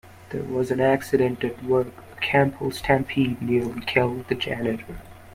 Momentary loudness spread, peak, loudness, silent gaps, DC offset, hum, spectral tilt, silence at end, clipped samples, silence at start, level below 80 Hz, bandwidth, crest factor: 12 LU; -4 dBFS; -24 LUFS; none; under 0.1%; none; -6.5 dB/octave; 0 s; under 0.1%; 0.05 s; -50 dBFS; 16 kHz; 20 dB